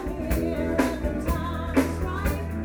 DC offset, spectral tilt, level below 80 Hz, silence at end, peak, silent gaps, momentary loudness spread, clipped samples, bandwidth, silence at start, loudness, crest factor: under 0.1%; -6.5 dB/octave; -32 dBFS; 0 s; -6 dBFS; none; 4 LU; under 0.1%; over 20 kHz; 0 s; -27 LUFS; 20 dB